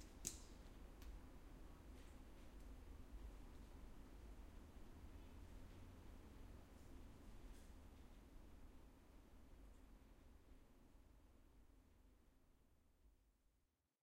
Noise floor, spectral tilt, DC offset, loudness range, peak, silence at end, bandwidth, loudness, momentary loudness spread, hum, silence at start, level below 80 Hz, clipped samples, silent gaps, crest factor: -86 dBFS; -4 dB/octave; under 0.1%; 5 LU; -26 dBFS; 0.35 s; 16 kHz; -63 LUFS; 7 LU; none; 0 s; -62 dBFS; under 0.1%; none; 34 dB